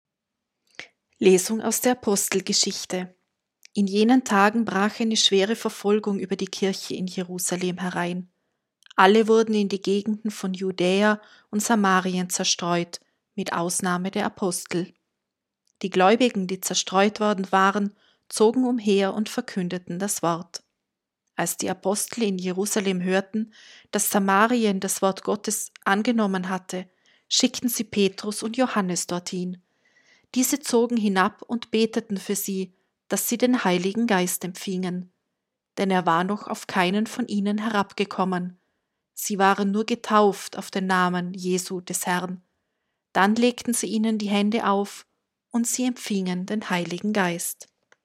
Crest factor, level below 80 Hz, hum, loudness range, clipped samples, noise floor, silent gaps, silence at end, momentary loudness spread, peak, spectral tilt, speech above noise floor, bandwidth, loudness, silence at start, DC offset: 22 dB; -74 dBFS; none; 4 LU; under 0.1%; -84 dBFS; none; 0.4 s; 11 LU; -2 dBFS; -4 dB/octave; 60 dB; 16 kHz; -23 LUFS; 0.8 s; under 0.1%